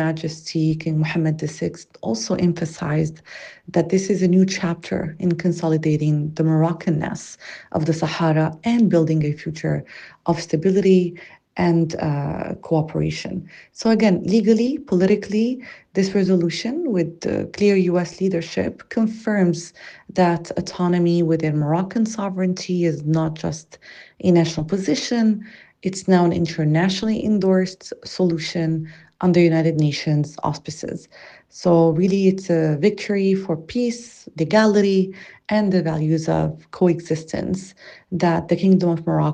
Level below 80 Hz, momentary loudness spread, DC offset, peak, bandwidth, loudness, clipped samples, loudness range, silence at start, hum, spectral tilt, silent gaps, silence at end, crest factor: -54 dBFS; 11 LU; under 0.1%; -4 dBFS; 9.4 kHz; -20 LUFS; under 0.1%; 2 LU; 0 s; none; -7 dB/octave; none; 0 s; 16 dB